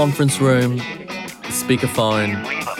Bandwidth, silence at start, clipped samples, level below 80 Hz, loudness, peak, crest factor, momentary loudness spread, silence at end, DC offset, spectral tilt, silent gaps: 17 kHz; 0 s; under 0.1%; -54 dBFS; -19 LUFS; -4 dBFS; 16 dB; 12 LU; 0 s; under 0.1%; -5 dB/octave; none